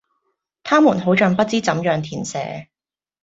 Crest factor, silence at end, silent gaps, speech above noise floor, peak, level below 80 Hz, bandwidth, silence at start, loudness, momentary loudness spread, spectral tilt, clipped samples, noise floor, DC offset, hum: 18 dB; 0.6 s; none; 55 dB; -2 dBFS; -58 dBFS; 8 kHz; 0.65 s; -18 LUFS; 15 LU; -5.5 dB/octave; under 0.1%; -72 dBFS; under 0.1%; none